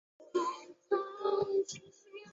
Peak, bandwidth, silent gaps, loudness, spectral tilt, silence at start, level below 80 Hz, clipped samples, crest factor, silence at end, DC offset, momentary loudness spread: -18 dBFS; 8 kHz; none; -35 LUFS; -4 dB/octave; 0.2 s; -80 dBFS; under 0.1%; 18 dB; 0 s; under 0.1%; 16 LU